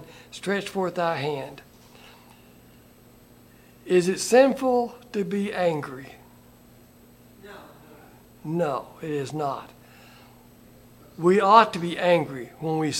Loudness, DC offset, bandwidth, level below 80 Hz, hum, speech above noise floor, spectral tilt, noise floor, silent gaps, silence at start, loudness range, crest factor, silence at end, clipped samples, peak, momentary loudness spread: -24 LUFS; under 0.1%; 17 kHz; -62 dBFS; none; 29 dB; -5 dB/octave; -53 dBFS; none; 0 s; 10 LU; 24 dB; 0 s; under 0.1%; -2 dBFS; 23 LU